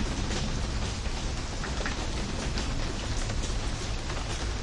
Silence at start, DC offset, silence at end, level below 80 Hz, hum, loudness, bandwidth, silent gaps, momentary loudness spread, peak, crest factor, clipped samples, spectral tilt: 0 s; under 0.1%; 0 s; -32 dBFS; none; -33 LUFS; 11.5 kHz; none; 2 LU; -16 dBFS; 14 dB; under 0.1%; -4 dB/octave